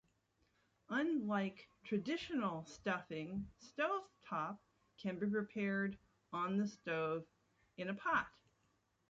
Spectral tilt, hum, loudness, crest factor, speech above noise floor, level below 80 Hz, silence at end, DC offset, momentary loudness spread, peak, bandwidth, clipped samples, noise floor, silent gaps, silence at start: -4.5 dB/octave; none; -41 LUFS; 20 dB; 39 dB; -74 dBFS; 0.8 s; under 0.1%; 10 LU; -22 dBFS; 7.6 kHz; under 0.1%; -80 dBFS; none; 0.9 s